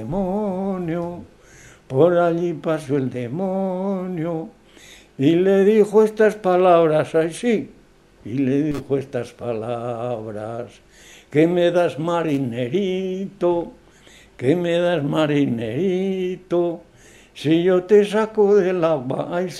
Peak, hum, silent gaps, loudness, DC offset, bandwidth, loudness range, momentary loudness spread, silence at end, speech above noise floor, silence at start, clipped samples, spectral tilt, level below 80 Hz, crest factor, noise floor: -2 dBFS; none; none; -20 LUFS; under 0.1%; 12.5 kHz; 6 LU; 12 LU; 0 s; 29 dB; 0 s; under 0.1%; -7 dB/octave; -54 dBFS; 18 dB; -49 dBFS